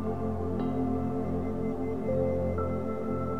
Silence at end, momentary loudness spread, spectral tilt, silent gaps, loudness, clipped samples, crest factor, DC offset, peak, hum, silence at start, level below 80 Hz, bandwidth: 0 s; 3 LU; -10 dB/octave; none; -31 LUFS; under 0.1%; 14 dB; 1%; -16 dBFS; none; 0 s; -46 dBFS; 7.8 kHz